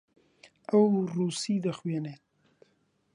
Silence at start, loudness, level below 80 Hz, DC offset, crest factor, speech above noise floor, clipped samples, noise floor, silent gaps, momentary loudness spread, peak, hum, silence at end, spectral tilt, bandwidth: 0.7 s; -28 LUFS; -76 dBFS; under 0.1%; 18 dB; 44 dB; under 0.1%; -71 dBFS; none; 14 LU; -12 dBFS; none; 1 s; -6.5 dB/octave; 11 kHz